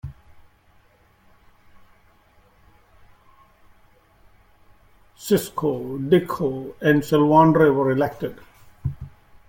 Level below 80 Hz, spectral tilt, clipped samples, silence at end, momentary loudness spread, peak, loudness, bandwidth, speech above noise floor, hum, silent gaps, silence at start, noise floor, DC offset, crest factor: -52 dBFS; -7 dB/octave; under 0.1%; 0.4 s; 18 LU; -2 dBFS; -20 LUFS; 17 kHz; 38 dB; none; none; 0.05 s; -57 dBFS; under 0.1%; 20 dB